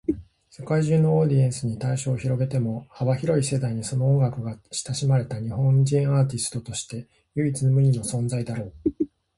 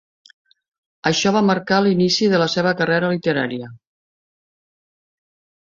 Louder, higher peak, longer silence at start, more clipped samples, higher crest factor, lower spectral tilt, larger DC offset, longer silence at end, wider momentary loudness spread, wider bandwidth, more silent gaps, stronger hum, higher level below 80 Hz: second, -24 LUFS vs -18 LUFS; second, -10 dBFS vs -2 dBFS; second, 0.1 s vs 1.05 s; neither; about the same, 14 dB vs 18 dB; first, -6.5 dB/octave vs -5 dB/octave; neither; second, 0.3 s vs 2 s; first, 12 LU vs 8 LU; first, 11.5 kHz vs 7.6 kHz; neither; neither; first, -52 dBFS vs -60 dBFS